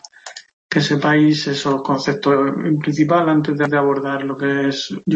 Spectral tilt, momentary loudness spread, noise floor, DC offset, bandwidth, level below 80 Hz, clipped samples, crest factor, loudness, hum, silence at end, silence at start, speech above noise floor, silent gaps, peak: -6 dB/octave; 8 LU; -38 dBFS; under 0.1%; 8 kHz; -60 dBFS; under 0.1%; 16 dB; -17 LUFS; none; 0 s; 0.25 s; 21 dB; 0.53-0.69 s; -2 dBFS